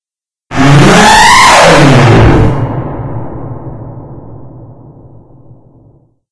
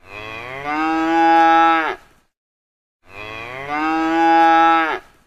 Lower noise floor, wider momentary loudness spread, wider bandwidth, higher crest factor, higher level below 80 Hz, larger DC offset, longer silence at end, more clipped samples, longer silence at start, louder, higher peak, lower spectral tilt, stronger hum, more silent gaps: about the same, under -90 dBFS vs under -90 dBFS; first, 22 LU vs 19 LU; first, 11 kHz vs 8 kHz; second, 8 dB vs 16 dB; first, -24 dBFS vs -52 dBFS; neither; first, 0.65 s vs 0.25 s; first, 7% vs under 0.1%; first, 0.5 s vs 0.1 s; first, -4 LUFS vs -15 LUFS; about the same, 0 dBFS vs 0 dBFS; about the same, -4.5 dB/octave vs -4.5 dB/octave; neither; second, none vs 2.37-3.00 s